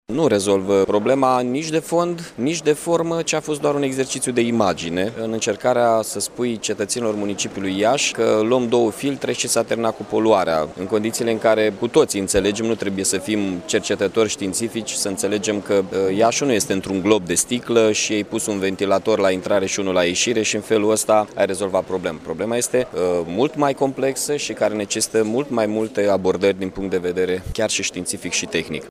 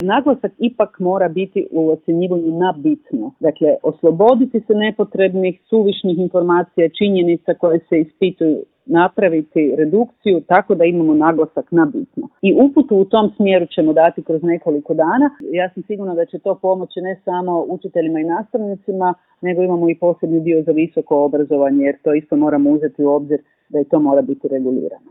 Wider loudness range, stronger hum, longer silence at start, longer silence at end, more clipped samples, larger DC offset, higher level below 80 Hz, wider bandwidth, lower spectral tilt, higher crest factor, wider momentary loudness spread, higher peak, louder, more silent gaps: about the same, 2 LU vs 4 LU; neither; about the same, 0.1 s vs 0 s; second, 0 s vs 0.15 s; neither; neither; first, -50 dBFS vs -62 dBFS; first, 15.5 kHz vs 4 kHz; second, -3.5 dB/octave vs -11 dB/octave; about the same, 18 dB vs 16 dB; about the same, 6 LU vs 7 LU; about the same, 0 dBFS vs 0 dBFS; second, -20 LUFS vs -16 LUFS; neither